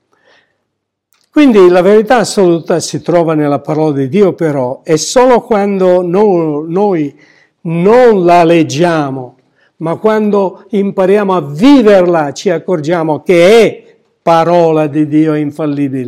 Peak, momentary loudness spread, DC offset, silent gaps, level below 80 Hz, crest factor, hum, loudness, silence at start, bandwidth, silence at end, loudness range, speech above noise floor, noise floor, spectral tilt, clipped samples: 0 dBFS; 9 LU; under 0.1%; none; -48 dBFS; 10 dB; none; -9 LUFS; 1.35 s; 14 kHz; 0 s; 2 LU; 61 dB; -70 dBFS; -6 dB/octave; under 0.1%